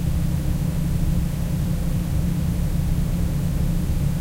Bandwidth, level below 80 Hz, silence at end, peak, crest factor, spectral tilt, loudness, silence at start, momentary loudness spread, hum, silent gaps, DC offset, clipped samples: 16 kHz; -26 dBFS; 0 s; -10 dBFS; 12 dB; -7 dB/octave; -24 LUFS; 0 s; 1 LU; none; none; under 0.1%; under 0.1%